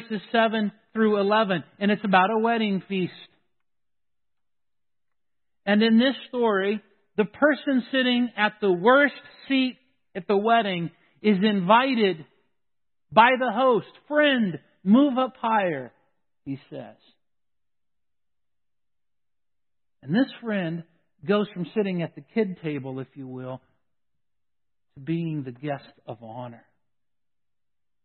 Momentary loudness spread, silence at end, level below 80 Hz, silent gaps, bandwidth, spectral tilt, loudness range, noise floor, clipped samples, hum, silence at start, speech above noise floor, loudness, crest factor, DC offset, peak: 18 LU; 1.5 s; -74 dBFS; none; 4.4 kHz; -10.5 dB/octave; 13 LU; under -90 dBFS; under 0.1%; none; 0 s; over 67 dB; -23 LUFS; 22 dB; under 0.1%; -2 dBFS